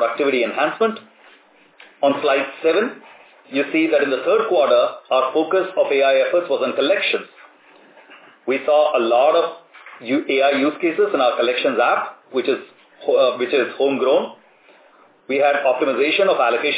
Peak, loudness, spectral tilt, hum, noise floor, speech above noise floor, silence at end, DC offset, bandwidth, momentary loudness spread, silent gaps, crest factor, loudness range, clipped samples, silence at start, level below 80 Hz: -4 dBFS; -18 LUFS; -7.5 dB/octave; none; -52 dBFS; 34 dB; 0 s; under 0.1%; 4 kHz; 8 LU; none; 14 dB; 3 LU; under 0.1%; 0 s; -84 dBFS